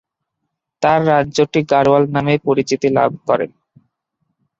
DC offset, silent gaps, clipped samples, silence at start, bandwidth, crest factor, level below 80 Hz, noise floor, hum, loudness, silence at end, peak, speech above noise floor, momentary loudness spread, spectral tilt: under 0.1%; none; under 0.1%; 0.8 s; 7.8 kHz; 16 dB; -52 dBFS; -76 dBFS; none; -15 LUFS; 1.1 s; -2 dBFS; 62 dB; 6 LU; -6 dB/octave